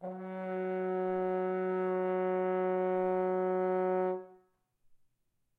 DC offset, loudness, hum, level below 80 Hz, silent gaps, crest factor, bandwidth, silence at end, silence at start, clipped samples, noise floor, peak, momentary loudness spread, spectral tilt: under 0.1%; -33 LUFS; none; -82 dBFS; none; 10 dB; 3.7 kHz; 0.65 s; 0 s; under 0.1%; -78 dBFS; -22 dBFS; 6 LU; -10 dB/octave